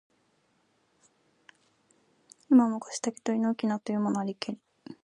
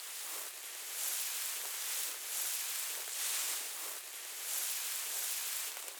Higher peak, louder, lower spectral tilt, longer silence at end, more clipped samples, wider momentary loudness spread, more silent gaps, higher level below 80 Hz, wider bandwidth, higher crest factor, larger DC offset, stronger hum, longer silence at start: first, -10 dBFS vs -18 dBFS; first, -28 LUFS vs -36 LUFS; first, -5.5 dB/octave vs 6 dB/octave; about the same, 0.1 s vs 0 s; neither; first, 15 LU vs 6 LU; neither; first, -80 dBFS vs under -90 dBFS; second, 10.5 kHz vs over 20 kHz; about the same, 20 dB vs 22 dB; neither; neither; first, 2.5 s vs 0 s